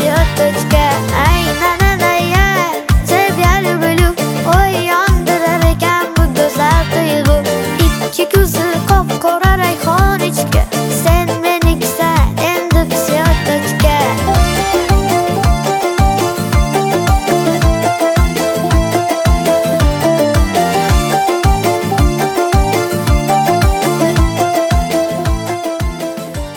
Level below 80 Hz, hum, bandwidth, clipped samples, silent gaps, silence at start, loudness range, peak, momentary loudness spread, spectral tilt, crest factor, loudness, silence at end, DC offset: -18 dBFS; none; 18.5 kHz; under 0.1%; none; 0 s; 1 LU; 0 dBFS; 3 LU; -5 dB/octave; 12 dB; -13 LUFS; 0 s; under 0.1%